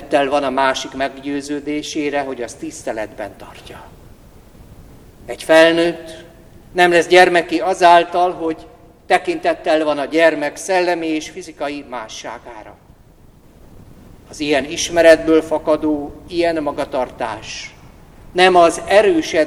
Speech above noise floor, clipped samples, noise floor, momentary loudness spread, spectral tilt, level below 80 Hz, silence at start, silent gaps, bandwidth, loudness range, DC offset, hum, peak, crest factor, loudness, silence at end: 30 dB; under 0.1%; -46 dBFS; 20 LU; -3.5 dB/octave; -46 dBFS; 0 s; none; 13.5 kHz; 12 LU; under 0.1%; none; 0 dBFS; 18 dB; -16 LUFS; 0 s